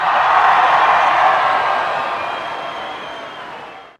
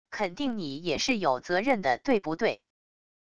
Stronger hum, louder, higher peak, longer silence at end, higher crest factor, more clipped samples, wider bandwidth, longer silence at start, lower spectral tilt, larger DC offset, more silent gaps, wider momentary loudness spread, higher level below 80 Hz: neither; first, -14 LUFS vs -28 LUFS; first, 0 dBFS vs -12 dBFS; second, 0.1 s vs 0.65 s; about the same, 16 dB vs 18 dB; neither; about the same, 11 kHz vs 11 kHz; about the same, 0 s vs 0.05 s; second, -2.5 dB/octave vs -4 dB/octave; second, under 0.1% vs 0.4%; neither; first, 18 LU vs 7 LU; about the same, -56 dBFS vs -60 dBFS